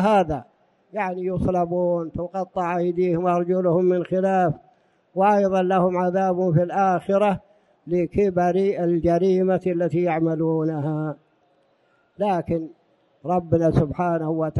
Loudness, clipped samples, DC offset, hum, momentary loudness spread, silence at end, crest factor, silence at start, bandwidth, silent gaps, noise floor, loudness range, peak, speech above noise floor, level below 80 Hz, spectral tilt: -22 LUFS; under 0.1%; under 0.1%; none; 9 LU; 0 s; 18 dB; 0 s; 11 kHz; none; -63 dBFS; 4 LU; -4 dBFS; 42 dB; -48 dBFS; -9 dB/octave